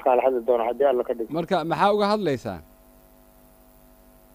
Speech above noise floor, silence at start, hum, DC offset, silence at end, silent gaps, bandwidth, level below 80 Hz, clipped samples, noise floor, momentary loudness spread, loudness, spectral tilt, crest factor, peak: 31 dB; 0 s; 50 Hz at -50 dBFS; under 0.1%; 1.7 s; none; 15.5 kHz; -56 dBFS; under 0.1%; -53 dBFS; 9 LU; -23 LUFS; -6.5 dB/octave; 18 dB; -6 dBFS